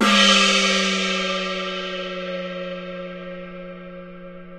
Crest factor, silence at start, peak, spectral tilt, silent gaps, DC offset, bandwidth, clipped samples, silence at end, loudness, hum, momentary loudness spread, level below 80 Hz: 18 dB; 0 s; -4 dBFS; -2.5 dB/octave; none; under 0.1%; 13.5 kHz; under 0.1%; 0 s; -19 LUFS; none; 24 LU; -56 dBFS